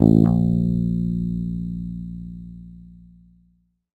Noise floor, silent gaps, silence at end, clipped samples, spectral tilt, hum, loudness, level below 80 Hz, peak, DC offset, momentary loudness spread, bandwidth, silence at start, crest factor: -63 dBFS; none; 1.05 s; under 0.1%; -12 dB/octave; 60 Hz at -70 dBFS; -22 LUFS; -38 dBFS; 0 dBFS; under 0.1%; 22 LU; 4.3 kHz; 0 s; 22 dB